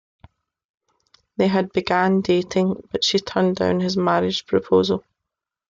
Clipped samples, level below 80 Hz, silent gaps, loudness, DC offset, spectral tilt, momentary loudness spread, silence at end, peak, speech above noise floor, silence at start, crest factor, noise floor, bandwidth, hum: under 0.1%; -58 dBFS; none; -20 LUFS; under 0.1%; -5.5 dB/octave; 4 LU; 0.7 s; -6 dBFS; 64 dB; 1.4 s; 16 dB; -84 dBFS; 7.6 kHz; none